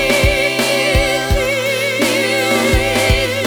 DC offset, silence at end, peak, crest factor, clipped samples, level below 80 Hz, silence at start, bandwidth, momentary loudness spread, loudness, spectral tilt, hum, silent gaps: under 0.1%; 0 s; 0 dBFS; 14 dB; under 0.1%; -24 dBFS; 0 s; over 20 kHz; 3 LU; -14 LUFS; -3.5 dB/octave; none; none